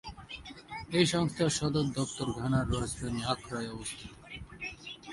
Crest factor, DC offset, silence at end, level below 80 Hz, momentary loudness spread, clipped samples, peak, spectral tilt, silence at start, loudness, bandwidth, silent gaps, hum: 22 dB; under 0.1%; 0 s; -50 dBFS; 16 LU; under 0.1%; -12 dBFS; -5 dB/octave; 0.05 s; -32 LUFS; 11.5 kHz; none; none